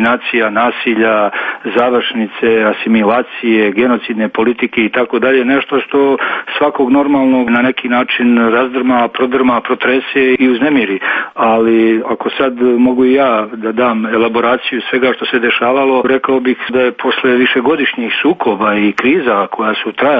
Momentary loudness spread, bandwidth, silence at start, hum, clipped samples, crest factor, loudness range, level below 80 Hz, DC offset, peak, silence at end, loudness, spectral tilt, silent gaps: 5 LU; 5 kHz; 0 s; none; under 0.1%; 12 dB; 1 LU; -52 dBFS; under 0.1%; 0 dBFS; 0 s; -12 LUFS; -7 dB/octave; none